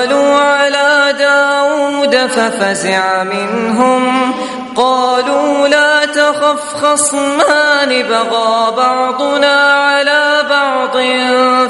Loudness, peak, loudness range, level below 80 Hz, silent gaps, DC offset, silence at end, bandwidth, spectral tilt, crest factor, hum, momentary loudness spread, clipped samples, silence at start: -11 LUFS; 0 dBFS; 2 LU; -58 dBFS; none; under 0.1%; 0 s; 11.5 kHz; -2 dB/octave; 12 dB; none; 5 LU; under 0.1%; 0 s